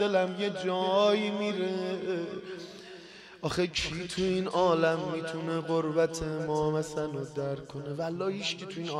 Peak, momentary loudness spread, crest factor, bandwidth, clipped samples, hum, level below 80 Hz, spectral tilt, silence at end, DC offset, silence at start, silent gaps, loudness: -12 dBFS; 13 LU; 18 dB; 13 kHz; under 0.1%; none; -56 dBFS; -5 dB/octave; 0 s; under 0.1%; 0 s; none; -30 LUFS